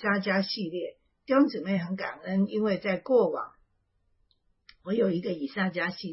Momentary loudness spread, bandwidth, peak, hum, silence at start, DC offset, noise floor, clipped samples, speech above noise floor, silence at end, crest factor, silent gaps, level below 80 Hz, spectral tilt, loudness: 11 LU; 5.8 kHz; -10 dBFS; none; 0 s; under 0.1%; -72 dBFS; under 0.1%; 44 dB; 0 s; 18 dB; none; -70 dBFS; -9.5 dB/octave; -28 LUFS